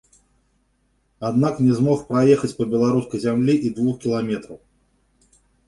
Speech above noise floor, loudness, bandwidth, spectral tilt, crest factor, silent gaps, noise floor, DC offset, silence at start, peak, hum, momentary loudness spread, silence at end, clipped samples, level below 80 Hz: 46 dB; -20 LUFS; 11.5 kHz; -7.5 dB/octave; 18 dB; none; -65 dBFS; under 0.1%; 1.2 s; -4 dBFS; 50 Hz at -50 dBFS; 7 LU; 1.1 s; under 0.1%; -56 dBFS